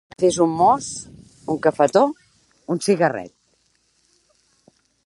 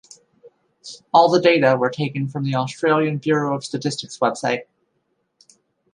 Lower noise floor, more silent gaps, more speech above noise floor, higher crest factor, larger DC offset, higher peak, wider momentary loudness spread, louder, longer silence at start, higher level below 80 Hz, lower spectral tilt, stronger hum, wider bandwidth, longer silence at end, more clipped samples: second, -64 dBFS vs -70 dBFS; neither; second, 46 dB vs 51 dB; about the same, 20 dB vs 20 dB; neither; about the same, -2 dBFS vs -2 dBFS; first, 23 LU vs 10 LU; about the same, -19 LUFS vs -19 LUFS; second, 0.2 s vs 0.45 s; first, -60 dBFS vs -70 dBFS; about the same, -5 dB/octave vs -5.5 dB/octave; neither; about the same, 11.5 kHz vs 11 kHz; first, 1.8 s vs 1.3 s; neither